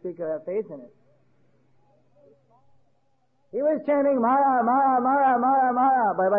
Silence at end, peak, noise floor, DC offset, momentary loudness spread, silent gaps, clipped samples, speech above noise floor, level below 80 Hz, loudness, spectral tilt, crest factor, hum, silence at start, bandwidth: 0 s; -12 dBFS; -70 dBFS; under 0.1%; 11 LU; none; under 0.1%; 48 dB; -78 dBFS; -22 LUFS; -10.5 dB/octave; 12 dB; none; 0.05 s; 3.4 kHz